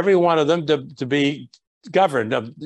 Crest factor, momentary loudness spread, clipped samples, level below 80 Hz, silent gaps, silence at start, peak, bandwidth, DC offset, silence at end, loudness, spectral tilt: 16 dB; 7 LU; under 0.1%; -66 dBFS; 1.67-1.81 s; 0 s; -4 dBFS; 11.5 kHz; under 0.1%; 0 s; -20 LUFS; -6 dB/octave